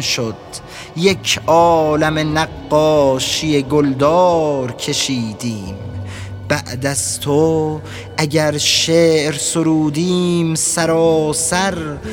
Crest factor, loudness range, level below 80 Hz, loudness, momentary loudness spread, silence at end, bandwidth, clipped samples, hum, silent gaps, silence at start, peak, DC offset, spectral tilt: 16 dB; 5 LU; -44 dBFS; -15 LUFS; 13 LU; 0 s; 19 kHz; under 0.1%; none; none; 0 s; 0 dBFS; under 0.1%; -4 dB/octave